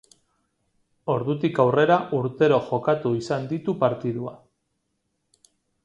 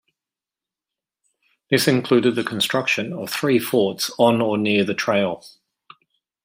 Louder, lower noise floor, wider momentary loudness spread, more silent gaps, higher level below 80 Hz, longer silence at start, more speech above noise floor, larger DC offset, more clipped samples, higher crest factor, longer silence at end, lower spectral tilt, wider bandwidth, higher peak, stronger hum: second, -23 LUFS vs -20 LUFS; second, -75 dBFS vs -89 dBFS; first, 10 LU vs 6 LU; neither; about the same, -66 dBFS vs -66 dBFS; second, 1.05 s vs 1.7 s; second, 53 dB vs 69 dB; neither; neither; about the same, 20 dB vs 20 dB; first, 1.5 s vs 0.95 s; first, -7.5 dB/octave vs -4.5 dB/octave; second, 11 kHz vs 16 kHz; about the same, -4 dBFS vs -2 dBFS; neither